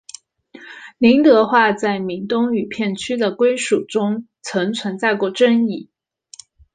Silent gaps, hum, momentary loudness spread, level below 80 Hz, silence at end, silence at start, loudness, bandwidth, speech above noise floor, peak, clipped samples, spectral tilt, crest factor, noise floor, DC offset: none; none; 13 LU; -60 dBFS; 0.9 s; 0.55 s; -17 LUFS; 9.6 kHz; 28 dB; -2 dBFS; under 0.1%; -5 dB/octave; 16 dB; -45 dBFS; under 0.1%